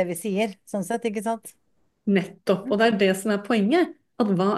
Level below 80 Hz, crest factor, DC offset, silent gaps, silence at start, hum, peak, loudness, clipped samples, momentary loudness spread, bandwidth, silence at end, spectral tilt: -70 dBFS; 18 dB; under 0.1%; none; 0 s; none; -6 dBFS; -24 LUFS; under 0.1%; 9 LU; 12.5 kHz; 0 s; -5.5 dB/octave